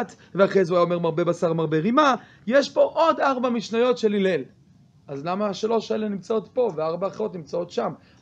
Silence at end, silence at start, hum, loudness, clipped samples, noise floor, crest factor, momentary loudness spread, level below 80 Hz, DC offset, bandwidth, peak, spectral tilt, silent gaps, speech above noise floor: 0.25 s; 0 s; none; -23 LUFS; under 0.1%; -54 dBFS; 18 dB; 10 LU; -68 dBFS; under 0.1%; 8.6 kHz; -6 dBFS; -6 dB/octave; none; 32 dB